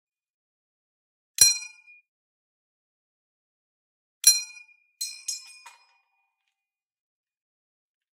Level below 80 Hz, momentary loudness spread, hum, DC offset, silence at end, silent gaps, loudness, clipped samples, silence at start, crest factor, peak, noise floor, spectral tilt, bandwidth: -78 dBFS; 20 LU; none; under 0.1%; 2.75 s; 2.08-4.21 s; -21 LUFS; under 0.1%; 1.4 s; 32 dB; 0 dBFS; -89 dBFS; 4 dB/octave; 16 kHz